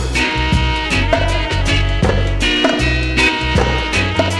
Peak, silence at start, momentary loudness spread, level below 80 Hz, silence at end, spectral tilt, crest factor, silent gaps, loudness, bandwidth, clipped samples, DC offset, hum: 0 dBFS; 0 s; 3 LU; -20 dBFS; 0 s; -4.5 dB/octave; 14 dB; none; -15 LUFS; 12 kHz; under 0.1%; under 0.1%; none